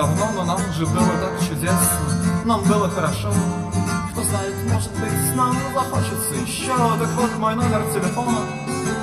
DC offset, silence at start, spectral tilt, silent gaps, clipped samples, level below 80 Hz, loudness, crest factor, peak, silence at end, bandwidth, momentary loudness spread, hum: under 0.1%; 0 s; -5 dB/octave; none; under 0.1%; -42 dBFS; -21 LUFS; 16 dB; -4 dBFS; 0 s; 15.5 kHz; 5 LU; none